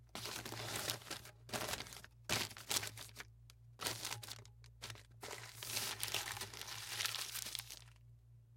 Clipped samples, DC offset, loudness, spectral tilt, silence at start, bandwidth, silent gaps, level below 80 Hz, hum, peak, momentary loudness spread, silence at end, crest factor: under 0.1%; under 0.1%; -43 LUFS; -1.5 dB/octave; 0 s; 17 kHz; none; -68 dBFS; none; -14 dBFS; 14 LU; 0 s; 32 dB